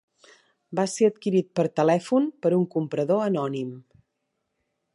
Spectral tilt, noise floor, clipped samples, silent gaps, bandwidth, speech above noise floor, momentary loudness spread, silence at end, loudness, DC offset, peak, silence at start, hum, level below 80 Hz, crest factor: -6.5 dB/octave; -78 dBFS; under 0.1%; none; 11.5 kHz; 55 dB; 8 LU; 1.15 s; -24 LUFS; under 0.1%; -8 dBFS; 0.7 s; none; -74 dBFS; 18 dB